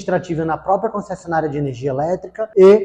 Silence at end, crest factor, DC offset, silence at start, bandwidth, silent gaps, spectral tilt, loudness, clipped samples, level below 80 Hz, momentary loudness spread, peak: 0 s; 14 dB; under 0.1%; 0 s; 8 kHz; none; -7.5 dB/octave; -19 LUFS; under 0.1%; -50 dBFS; 10 LU; -2 dBFS